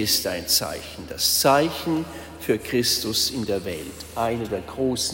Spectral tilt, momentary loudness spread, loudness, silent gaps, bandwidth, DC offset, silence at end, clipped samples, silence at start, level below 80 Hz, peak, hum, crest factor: -3 dB/octave; 14 LU; -23 LUFS; none; 16.5 kHz; under 0.1%; 0 s; under 0.1%; 0 s; -48 dBFS; -6 dBFS; none; 18 dB